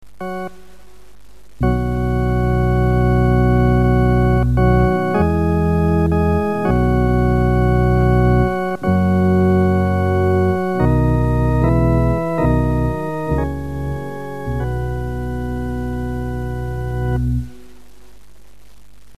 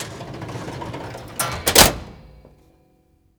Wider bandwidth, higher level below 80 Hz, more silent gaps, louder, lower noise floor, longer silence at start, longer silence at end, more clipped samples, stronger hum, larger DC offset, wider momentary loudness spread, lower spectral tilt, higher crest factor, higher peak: second, 13.5 kHz vs over 20 kHz; first, -24 dBFS vs -38 dBFS; neither; about the same, -17 LUFS vs -15 LUFS; second, -47 dBFS vs -59 dBFS; first, 0.2 s vs 0 s; second, 0 s vs 1.05 s; neither; neither; first, 2% vs under 0.1%; second, 10 LU vs 21 LU; first, -9 dB/octave vs -2 dB/octave; second, 14 dB vs 24 dB; about the same, -2 dBFS vs 0 dBFS